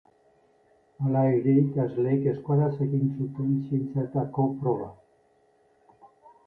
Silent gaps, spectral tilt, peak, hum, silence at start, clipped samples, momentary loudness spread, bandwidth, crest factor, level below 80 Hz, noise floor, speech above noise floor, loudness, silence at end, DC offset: none; -12.5 dB/octave; -12 dBFS; none; 1 s; under 0.1%; 7 LU; 2.9 kHz; 16 dB; -64 dBFS; -64 dBFS; 39 dB; -26 LUFS; 0.4 s; under 0.1%